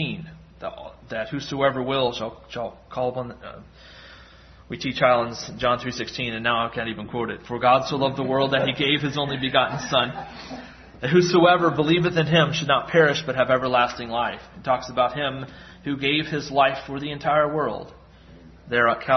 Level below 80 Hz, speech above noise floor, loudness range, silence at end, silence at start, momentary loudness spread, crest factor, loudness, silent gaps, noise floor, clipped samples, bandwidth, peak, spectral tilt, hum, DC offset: -52 dBFS; 25 dB; 8 LU; 0 s; 0 s; 16 LU; 20 dB; -22 LUFS; none; -48 dBFS; under 0.1%; 6.4 kHz; -4 dBFS; -5 dB/octave; none; under 0.1%